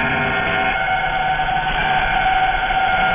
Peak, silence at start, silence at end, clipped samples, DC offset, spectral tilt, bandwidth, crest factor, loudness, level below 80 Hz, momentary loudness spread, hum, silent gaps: -6 dBFS; 0 s; 0 s; under 0.1%; under 0.1%; -7.5 dB/octave; 3.7 kHz; 12 dB; -17 LUFS; -34 dBFS; 2 LU; none; none